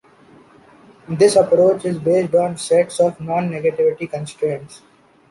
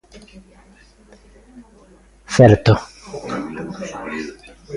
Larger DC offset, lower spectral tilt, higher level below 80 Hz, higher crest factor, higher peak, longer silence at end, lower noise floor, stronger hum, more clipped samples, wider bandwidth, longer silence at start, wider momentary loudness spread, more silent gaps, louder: neither; about the same, -5.5 dB/octave vs -6.5 dB/octave; second, -60 dBFS vs -42 dBFS; about the same, 16 dB vs 20 dB; about the same, -2 dBFS vs 0 dBFS; first, 0.55 s vs 0 s; about the same, -48 dBFS vs -49 dBFS; neither; neither; about the same, 11.5 kHz vs 11 kHz; first, 1.1 s vs 0.15 s; second, 11 LU vs 21 LU; neither; about the same, -17 LUFS vs -17 LUFS